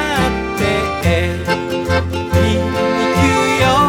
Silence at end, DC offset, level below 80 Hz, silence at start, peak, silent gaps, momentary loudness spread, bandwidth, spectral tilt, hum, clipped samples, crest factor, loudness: 0 s; under 0.1%; -30 dBFS; 0 s; 0 dBFS; none; 5 LU; 17 kHz; -5.5 dB/octave; none; under 0.1%; 14 dB; -16 LUFS